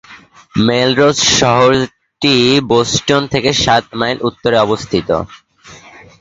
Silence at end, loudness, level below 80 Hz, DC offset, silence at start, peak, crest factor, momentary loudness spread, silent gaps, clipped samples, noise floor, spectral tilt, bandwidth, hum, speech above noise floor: 0.45 s; -12 LUFS; -42 dBFS; under 0.1%; 0.1 s; 0 dBFS; 14 dB; 8 LU; none; under 0.1%; -40 dBFS; -4 dB/octave; 8 kHz; none; 27 dB